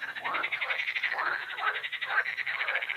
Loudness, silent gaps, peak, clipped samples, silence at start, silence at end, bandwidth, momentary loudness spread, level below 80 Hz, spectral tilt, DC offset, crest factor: -30 LUFS; none; -14 dBFS; under 0.1%; 0 s; 0 s; 15.5 kHz; 3 LU; -80 dBFS; -1 dB/octave; under 0.1%; 18 dB